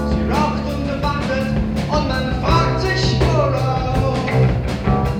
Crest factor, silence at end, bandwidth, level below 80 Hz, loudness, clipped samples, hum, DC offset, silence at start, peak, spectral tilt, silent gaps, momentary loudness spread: 14 dB; 0 s; 15 kHz; -26 dBFS; -18 LUFS; under 0.1%; none; under 0.1%; 0 s; -4 dBFS; -6.5 dB/octave; none; 4 LU